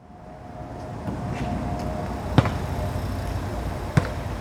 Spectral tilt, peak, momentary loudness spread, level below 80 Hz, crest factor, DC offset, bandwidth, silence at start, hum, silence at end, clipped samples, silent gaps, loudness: -7 dB/octave; 0 dBFS; 15 LU; -36 dBFS; 26 dB; under 0.1%; 16.5 kHz; 0 s; none; 0 s; under 0.1%; none; -28 LUFS